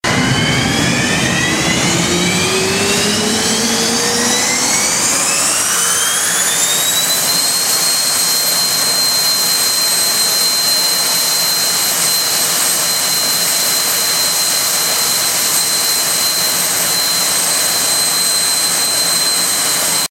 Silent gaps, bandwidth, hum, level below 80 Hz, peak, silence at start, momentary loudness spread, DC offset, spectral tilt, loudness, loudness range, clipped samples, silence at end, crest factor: none; 16 kHz; none; -44 dBFS; 0 dBFS; 0.05 s; 2 LU; under 0.1%; -1 dB/octave; -11 LUFS; 2 LU; under 0.1%; 0.05 s; 14 dB